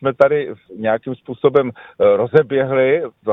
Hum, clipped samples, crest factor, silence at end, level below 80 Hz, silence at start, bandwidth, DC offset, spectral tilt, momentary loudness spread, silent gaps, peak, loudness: none; under 0.1%; 16 dB; 0 s; -58 dBFS; 0 s; 4.7 kHz; under 0.1%; -9 dB/octave; 9 LU; none; 0 dBFS; -17 LUFS